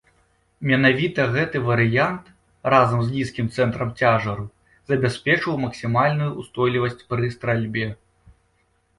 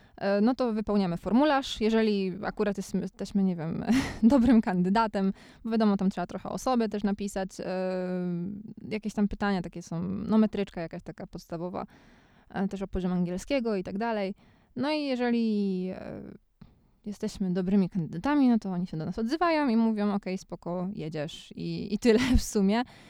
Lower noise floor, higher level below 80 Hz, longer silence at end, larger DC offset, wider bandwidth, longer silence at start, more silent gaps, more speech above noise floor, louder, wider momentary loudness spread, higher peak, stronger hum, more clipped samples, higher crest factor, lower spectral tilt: first, -65 dBFS vs -56 dBFS; second, -52 dBFS vs -46 dBFS; first, 1.05 s vs 0.15 s; neither; second, 11.5 kHz vs 15.5 kHz; first, 0.6 s vs 0.2 s; neither; first, 44 dB vs 29 dB; first, -21 LUFS vs -28 LUFS; second, 10 LU vs 13 LU; first, -4 dBFS vs -10 dBFS; neither; neither; about the same, 18 dB vs 18 dB; about the same, -7 dB/octave vs -6.5 dB/octave